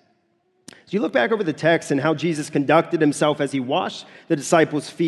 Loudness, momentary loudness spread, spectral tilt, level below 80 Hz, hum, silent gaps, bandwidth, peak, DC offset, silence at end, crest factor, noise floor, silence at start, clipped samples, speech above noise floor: -21 LUFS; 7 LU; -5 dB/octave; -68 dBFS; none; none; 12.5 kHz; -2 dBFS; under 0.1%; 0 s; 20 dB; -66 dBFS; 0.9 s; under 0.1%; 46 dB